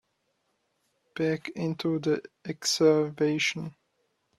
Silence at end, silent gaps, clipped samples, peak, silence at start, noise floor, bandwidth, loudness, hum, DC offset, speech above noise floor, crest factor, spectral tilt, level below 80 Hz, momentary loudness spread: 0.65 s; none; under 0.1%; -10 dBFS; 1.15 s; -76 dBFS; 13.5 kHz; -27 LUFS; none; under 0.1%; 48 dB; 20 dB; -4.5 dB/octave; -72 dBFS; 16 LU